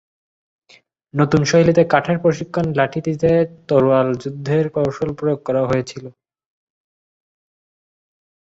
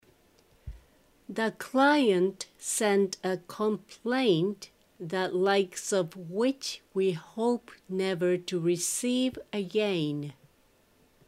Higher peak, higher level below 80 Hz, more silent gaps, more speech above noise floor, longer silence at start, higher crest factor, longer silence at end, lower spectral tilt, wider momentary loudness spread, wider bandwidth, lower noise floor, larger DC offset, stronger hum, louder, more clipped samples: first, -2 dBFS vs -12 dBFS; first, -50 dBFS vs -60 dBFS; neither; about the same, 36 dB vs 36 dB; first, 1.15 s vs 0.65 s; about the same, 18 dB vs 18 dB; first, 2.35 s vs 0.95 s; first, -6.5 dB/octave vs -4.5 dB/octave; second, 8 LU vs 12 LU; second, 8 kHz vs 16 kHz; second, -53 dBFS vs -65 dBFS; neither; neither; first, -18 LUFS vs -29 LUFS; neither